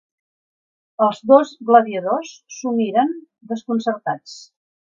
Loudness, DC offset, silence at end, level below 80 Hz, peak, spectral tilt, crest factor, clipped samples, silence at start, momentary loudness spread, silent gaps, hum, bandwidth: -19 LUFS; under 0.1%; 0.55 s; -74 dBFS; 0 dBFS; -5.5 dB/octave; 20 dB; under 0.1%; 1 s; 20 LU; none; none; 7.6 kHz